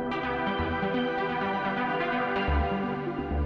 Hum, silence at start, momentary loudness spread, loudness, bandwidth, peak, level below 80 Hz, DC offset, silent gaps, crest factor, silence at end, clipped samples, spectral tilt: none; 0 s; 3 LU; -29 LUFS; 6.4 kHz; -14 dBFS; -38 dBFS; under 0.1%; none; 14 dB; 0 s; under 0.1%; -8 dB/octave